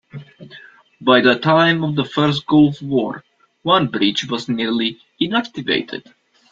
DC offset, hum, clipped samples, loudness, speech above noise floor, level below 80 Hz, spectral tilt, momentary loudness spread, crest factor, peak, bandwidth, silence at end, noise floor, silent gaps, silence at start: under 0.1%; none; under 0.1%; -17 LUFS; 27 dB; -56 dBFS; -6 dB/octave; 13 LU; 18 dB; -2 dBFS; 7.6 kHz; 0.5 s; -44 dBFS; none; 0.15 s